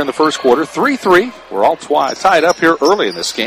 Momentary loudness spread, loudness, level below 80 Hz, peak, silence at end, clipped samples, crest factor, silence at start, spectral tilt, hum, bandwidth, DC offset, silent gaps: 5 LU; -13 LUFS; -52 dBFS; 0 dBFS; 0 s; under 0.1%; 14 dB; 0 s; -3.5 dB/octave; none; 15.5 kHz; under 0.1%; none